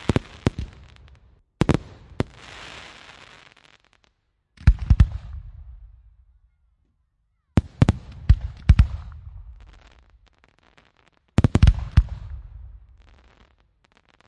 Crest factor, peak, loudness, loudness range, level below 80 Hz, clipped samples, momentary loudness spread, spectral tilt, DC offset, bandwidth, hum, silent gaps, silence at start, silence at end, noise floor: 22 dB; -2 dBFS; -22 LUFS; 6 LU; -28 dBFS; under 0.1%; 25 LU; -7.5 dB/octave; under 0.1%; 10.5 kHz; none; none; 0.1 s; 1.85 s; -70 dBFS